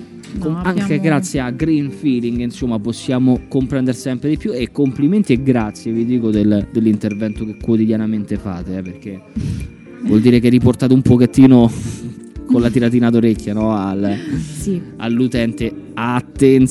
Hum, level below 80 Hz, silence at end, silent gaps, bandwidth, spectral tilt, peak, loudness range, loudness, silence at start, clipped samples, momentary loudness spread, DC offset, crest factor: none; -36 dBFS; 0 s; none; 12 kHz; -7.5 dB/octave; 0 dBFS; 6 LU; -16 LUFS; 0 s; 0.1%; 13 LU; under 0.1%; 16 dB